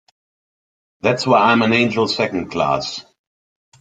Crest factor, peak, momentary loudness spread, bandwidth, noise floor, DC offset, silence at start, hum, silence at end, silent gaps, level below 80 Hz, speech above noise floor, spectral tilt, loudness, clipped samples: 18 dB; -2 dBFS; 9 LU; 9.2 kHz; under -90 dBFS; under 0.1%; 1.05 s; none; 0.8 s; none; -56 dBFS; over 73 dB; -5 dB/octave; -17 LUFS; under 0.1%